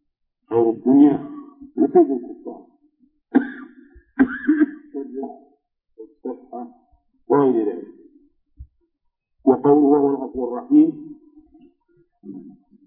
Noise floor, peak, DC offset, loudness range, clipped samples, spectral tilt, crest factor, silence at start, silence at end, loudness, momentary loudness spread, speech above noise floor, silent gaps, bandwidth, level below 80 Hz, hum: -72 dBFS; -2 dBFS; under 0.1%; 6 LU; under 0.1%; -12 dB/octave; 18 dB; 0.5 s; 0.35 s; -19 LUFS; 24 LU; 54 dB; none; 3.5 kHz; -58 dBFS; none